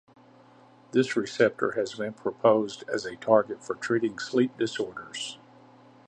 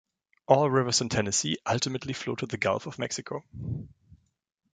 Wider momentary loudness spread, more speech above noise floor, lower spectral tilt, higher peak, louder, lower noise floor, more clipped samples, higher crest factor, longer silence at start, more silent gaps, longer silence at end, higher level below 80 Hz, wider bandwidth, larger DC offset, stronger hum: about the same, 11 LU vs 13 LU; about the same, 29 dB vs 32 dB; about the same, -5 dB/octave vs -4 dB/octave; about the same, -6 dBFS vs -6 dBFS; about the same, -27 LUFS vs -28 LUFS; second, -55 dBFS vs -60 dBFS; neither; about the same, 22 dB vs 24 dB; first, 0.95 s vs 0.5 s; neither; second, 0.7 s vs 0.85 s; second, -72 dBFS vs -56 dBFS; about the same, 9.8 kHz vs 9.6 kHz; neither; neither